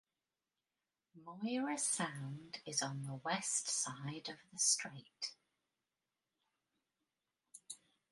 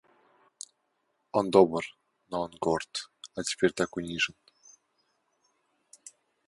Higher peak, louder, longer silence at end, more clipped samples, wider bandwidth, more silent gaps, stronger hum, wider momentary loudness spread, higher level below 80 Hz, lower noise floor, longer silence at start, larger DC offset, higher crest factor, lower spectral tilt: second, -18 dBFS vs -6 dBFS; second, -39 LUFS vs -29 LUFS; second, 0.35 s vs 2.2 s; neither; about the same, 11.5 kHz vs 11.5 kHz; neither; neither; second, 19 LU vs 23 LU; second, -86 dBFS vs -64 dBFS; first, under -90 dBFS vs -77 dBFS; second, 1.15 s vs 1.35 s; neither; about the same, 26 dB vs 26 dB; second, -2 dB/octave vs -4 dB/octave